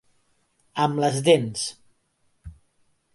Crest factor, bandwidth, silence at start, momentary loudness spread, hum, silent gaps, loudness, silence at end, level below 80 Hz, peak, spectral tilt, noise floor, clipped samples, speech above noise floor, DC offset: 20 dB; 11.5 kHz; 0.75 s; 12 LU; none; none; -23 LUFS; 0.65 s; -56 dBFS; -6 dBFS; -4.5 dB/octave; -68 dBFS; under 0.1%; 47 dB; under 0.1%